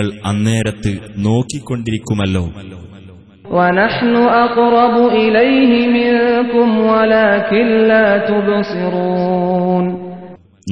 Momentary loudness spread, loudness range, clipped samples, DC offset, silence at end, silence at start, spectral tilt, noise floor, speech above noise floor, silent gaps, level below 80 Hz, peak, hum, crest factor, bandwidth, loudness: 10 LU; 7 LU; under 0.1%; 0.2%; 0 s; 0 s; -6.5 dB/octave; -38 dBFS; 25 dB; none; -44 dBFS; 0 dBFS; none; 14 dB; 11 kHz; -13 LUFS